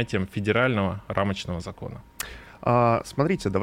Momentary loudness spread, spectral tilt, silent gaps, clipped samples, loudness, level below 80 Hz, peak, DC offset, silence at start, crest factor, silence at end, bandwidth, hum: 14 LU; -6 dB/octave; none; under 0.1%; -25 LUFS; -50 dBFS; -8 dBFS; under 0.1%; 0 s; 18 dB; 0 s; 16.5 kHz; none